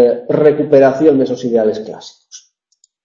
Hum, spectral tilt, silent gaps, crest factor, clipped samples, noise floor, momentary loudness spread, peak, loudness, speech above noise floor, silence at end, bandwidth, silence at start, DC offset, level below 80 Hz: none; -7 dB/octave; none; 14 dB; under 0.1%; -59 dBFS; 19 LU; 0 dBFS; -12 LUFS; 47 dB; 0.65 s; 7.4 kHz; 0 s; under 0.1%; -56 dBFS